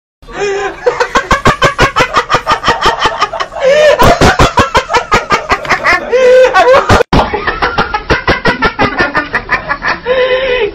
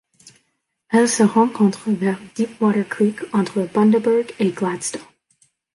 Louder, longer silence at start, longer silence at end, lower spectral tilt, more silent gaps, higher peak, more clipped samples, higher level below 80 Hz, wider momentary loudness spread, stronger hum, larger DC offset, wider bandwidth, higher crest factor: first, -9 LUFS vs -19 LUFS; second, 0.25 s vs 0.9 s; second, 0 s vs 0.7 s; about the same, -4.5 dB/octave vs -5.5 dB/octave; neither; first, 0 dBFS vs -4 dBFS; neither; first, -24 dBFS vs -66 dBFS; about the same, 8 LU vs 9 LU; neither; neither; first, 16.5 kHz vs 11.5 kHz; second, 10 dB vs 16 dB